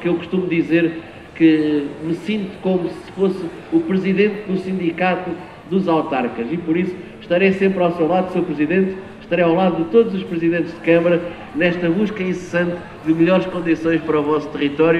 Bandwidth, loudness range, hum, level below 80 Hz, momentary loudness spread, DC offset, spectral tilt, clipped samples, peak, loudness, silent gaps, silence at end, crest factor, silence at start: 8.4 kHz; 3 LU; none; -52 dBFS; 9 LU; under 0.1%; -8 dB/octave; under 0.1%; -2 dBFS; -19 LUFS; none; 0 s; 16 dB; 0 s